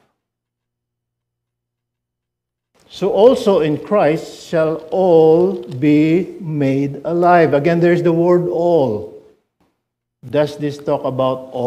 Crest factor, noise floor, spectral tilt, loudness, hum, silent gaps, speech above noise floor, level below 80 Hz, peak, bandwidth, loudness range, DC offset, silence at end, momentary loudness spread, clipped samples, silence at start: 16 dB; -80 dBFS; -7.5 dB/octave; -15 LUFS; 60 Hz at -50 dBFS; none; 66 dB; -58 dBFS; 0 dBFS; 12.5 kHz; 5 LU; under 0.1%; 0 s; 10 LU; under 0.1%; 2.95 s